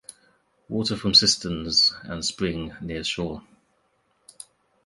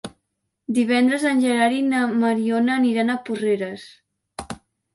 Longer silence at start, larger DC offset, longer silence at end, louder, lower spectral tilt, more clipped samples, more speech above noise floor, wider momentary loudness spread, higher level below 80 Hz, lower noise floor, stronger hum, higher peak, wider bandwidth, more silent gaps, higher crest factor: first, 0.7 s vs 0.05 s; neither; first, 1.45 s vs 0.4 s; about the same, -22 LUFS vs -20 LUFS; second, -3 dB/octave vs -5 dB/octave; neither; second, 44 dB vs 56 dB; second, 17 LU vs 20 LU; first, -50 dBFS vs -60 dBFS; second, -68 dBFS vs -76 dBFS; neither; about the same, -4 dBFS vs -6 dBFS; about the same, 11.5 kHz vs 11.5 kHz; neither; first, 24 dB vs 14 dB